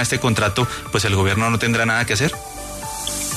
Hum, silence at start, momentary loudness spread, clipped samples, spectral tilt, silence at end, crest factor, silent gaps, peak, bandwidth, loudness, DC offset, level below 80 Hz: none; 0 s; 11 LU; under 0.1%; -4 dB/octave; 0 s; 14 dB; none; -6 dBFS; 13.5 kHz; -19 LUFS; under 0.1%; -42 dBFS